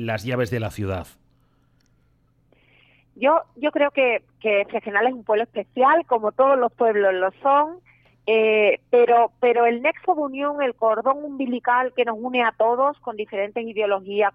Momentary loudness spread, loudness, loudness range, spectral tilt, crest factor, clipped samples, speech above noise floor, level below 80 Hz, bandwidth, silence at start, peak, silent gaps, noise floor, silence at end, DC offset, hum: 9 LU; -21 LUFS; 6 LU; -6.5 dB/octave; 16 dB; under 0.1%; 41 dB; -62 dBFS; 14 kHz; 0 s; -6 dBFS; none; -62 dBFS; 0.05 s; under 0.1%; none